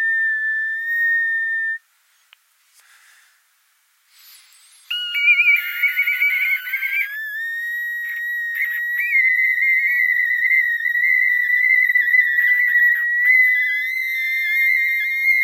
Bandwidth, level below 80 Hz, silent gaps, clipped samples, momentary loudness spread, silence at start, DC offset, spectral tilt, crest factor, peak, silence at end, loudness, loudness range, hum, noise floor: 16.5 kHz; under -90 dBFS; none; under 0.1%; 10 LU; 0 s; under 0.1%; 10.5 dB/octave; 14 dB; -6 dBFS; 0 s; -16 LUFS; 9 LU; none; -61 dBFS